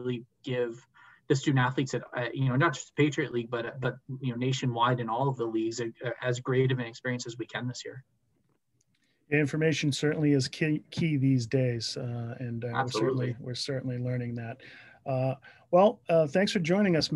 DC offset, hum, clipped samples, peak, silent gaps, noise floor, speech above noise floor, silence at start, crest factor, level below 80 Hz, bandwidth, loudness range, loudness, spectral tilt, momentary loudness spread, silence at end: under 0.1%; none; under 0.1%; -10 dBFS; none; -74 dBFS; 45 dB; 0 s; 18 dB; -66 dBFS; 11.5 kHz; 5 LU; -29 LUFS; -6 dB/octave; 11 LU; 0 s